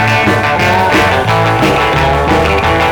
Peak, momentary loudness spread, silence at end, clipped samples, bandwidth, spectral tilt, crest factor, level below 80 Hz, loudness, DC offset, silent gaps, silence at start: 0 dBFS; 1 LU; 0 s; under 0.1%; over 20 kHz; -5.5 dB/octave; 10 dB; -26 dBFS; -10 LUFS; 0.4%; none; 0 s